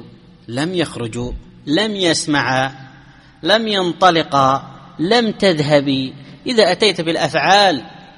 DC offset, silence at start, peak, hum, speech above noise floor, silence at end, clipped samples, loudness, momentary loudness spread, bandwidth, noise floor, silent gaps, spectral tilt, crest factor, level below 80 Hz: under 0.1%; 0 s; 0 dBFS; none; 28 dB; 0.1 s; under 0.1%; -16 LUFS; 12 LU; 11.5 kHz; -44 dBFS; none; -4 dB/octave; 16 dB; -44 dBFS